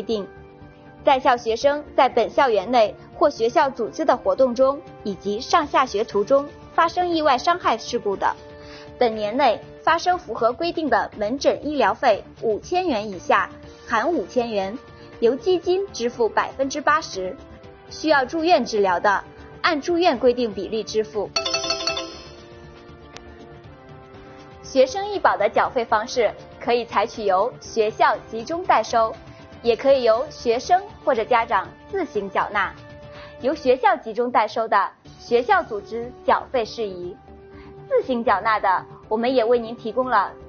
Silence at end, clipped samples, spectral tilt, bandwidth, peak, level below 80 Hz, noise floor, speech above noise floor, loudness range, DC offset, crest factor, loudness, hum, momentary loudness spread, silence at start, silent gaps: 0 s; under 0.1%; -2 dB/octave; 6.8 kHz; -2 dBFS; -52 dBFS; -44 dBFS; 24 dB; 3 LU; under 0.1%; 20 dB; -21 LUFS; none; 11 LU; 0 s; none